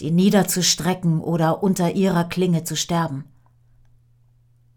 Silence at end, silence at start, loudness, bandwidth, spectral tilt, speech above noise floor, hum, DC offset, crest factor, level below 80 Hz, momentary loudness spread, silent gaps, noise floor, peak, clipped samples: 1.55 s; 0 s; -20 LUFS; 19.5 kHz; -5 dB/octave; 37 dB; none; under 0.1%; 18 dB; -54 dBFS; 6 LU; none; -56 dBFS; -4 dBFS; under 0.1%